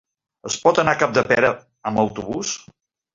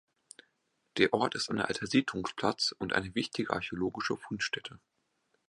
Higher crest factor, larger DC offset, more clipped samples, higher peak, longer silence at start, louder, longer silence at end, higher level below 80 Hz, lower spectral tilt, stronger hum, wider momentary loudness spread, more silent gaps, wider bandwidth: second, 20 dB vs 26 dB; neither; neither; first, -2 dBFS vs -8 dBFS; second, 0.45 s vs 0.95 s; first, -20 LUFS vs -32 LUFS; about the same, 0.6 s vs 0.7 s; first, -54 dBFS vs -64 dBFS; about the same, -4 dB/octave vs -4 dB/octave; neither; first, 12 LU vs 7 LU; neither; second, 7.8 kHz vs 11.5 kHz